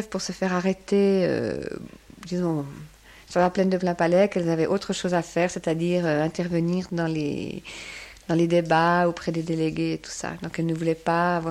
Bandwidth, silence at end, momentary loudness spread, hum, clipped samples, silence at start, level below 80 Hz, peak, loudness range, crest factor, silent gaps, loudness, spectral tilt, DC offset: 12.5 kHz; 0 s; 14 LU; none; under 0.1%; 0 s; -54 dBFS; -8 dBFS; 3 LU; 16 dB; none; -24 LUFS; -6 dB/octave; under 0.1%